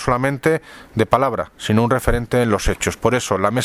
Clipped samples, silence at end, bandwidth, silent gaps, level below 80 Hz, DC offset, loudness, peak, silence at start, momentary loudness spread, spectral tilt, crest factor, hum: under 0.1%; 0 s; 16 kHz; none; -32 dBFS; under 0.1%; -19 LUFS; 0 dBFS; 0 s; 5 LU; -5.5 dB/octave; 18 dB; none